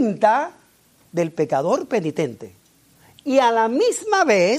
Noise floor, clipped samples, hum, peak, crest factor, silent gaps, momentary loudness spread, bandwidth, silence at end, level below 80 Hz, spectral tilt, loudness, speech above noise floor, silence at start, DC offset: -56 dBFS; under 0.1%; none; -4 dBFS; 18 dB; none; 12 LU; 15 kHz; 0 s; -70 dBFS; -4.5 dB/octave; -20 LUFS; 37 dB; 0 s; under 0.1%